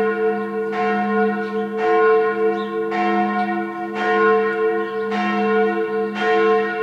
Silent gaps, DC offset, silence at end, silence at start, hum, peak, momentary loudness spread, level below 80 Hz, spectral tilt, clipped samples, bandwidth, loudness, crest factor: none; under 0.1%; 0 s; 0 s; none; -4 dBFS; 7 LU; -78 dBFS; -7 dB/octave; under 0.1%; 7.2 kHz; -19 LUFS; 14 dB